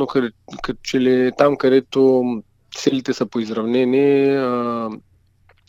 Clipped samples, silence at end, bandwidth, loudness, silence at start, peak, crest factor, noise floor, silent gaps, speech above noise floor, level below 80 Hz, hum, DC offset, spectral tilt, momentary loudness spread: under 0.1%; 0.7 s; 7.8 kHz; -18 LUFS; 0 s; 0 dBFS; 18 dB; -56 dBFS; none; 38 dB; -52 dBFS; none; under 0.1%; -6 dB/octave; 14 LU